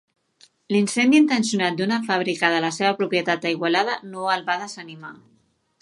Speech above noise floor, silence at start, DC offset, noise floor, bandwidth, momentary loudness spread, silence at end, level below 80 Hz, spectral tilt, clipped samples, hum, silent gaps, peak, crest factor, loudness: 36 dB; 0.7 s; under 0.1%; -58 dBFS; 11.5 kHz; 13 LU; 0.65 s; -74 dBFS; -4 dB/octave; under 0.1%; none; none; -2 dBFS; 20 dB; -21 LUFS